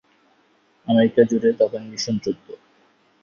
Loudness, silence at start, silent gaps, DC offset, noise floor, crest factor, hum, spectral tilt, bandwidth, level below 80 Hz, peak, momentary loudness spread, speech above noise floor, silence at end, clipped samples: -20 LUFS; 0.85 s; none; under 0.1%; -61 dBFS; 20 dB; none; -5.5 dB/octave; 7.2 kHz; -62 dBFS; -2 dBFS; 13 LU; 41 dB; 0.65 s; under 0.1%